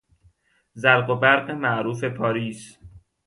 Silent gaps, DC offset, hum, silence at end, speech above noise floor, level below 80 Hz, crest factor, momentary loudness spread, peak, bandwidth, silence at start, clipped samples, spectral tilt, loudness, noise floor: none; under 0.1%; none; 0.3 s; 39 dB; -60 dBFS; 22 dB; 10 LU; -2 dBFS; 11.5 kHz; 0.75 s; under 0.1%; -5.5 dB/octave; -21 LUFS; -61 dBFS